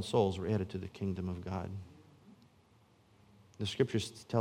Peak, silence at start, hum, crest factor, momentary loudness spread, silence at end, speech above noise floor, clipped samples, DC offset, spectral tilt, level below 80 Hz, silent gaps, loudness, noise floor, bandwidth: -16 dBFS; 0 s; none; 22 dB; 11 LU; 0 s; 31 dB; under 0.1%; under 0.1%; -6.5 dB/octave; -68 dBFS; none; -36 LUFS; -66 dBFS; 15.5 kHz